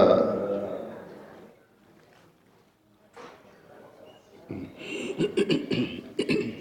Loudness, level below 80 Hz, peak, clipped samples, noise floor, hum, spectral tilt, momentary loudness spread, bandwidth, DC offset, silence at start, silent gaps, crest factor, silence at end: -29 LUFS; -66 dBFS; -6 dBFS; under 0.1%; -62 dBFS; none; -6 dB/octave; 25 LU; 17 kHz; under 0.1%; 0 s; none; 24 dB; 0 s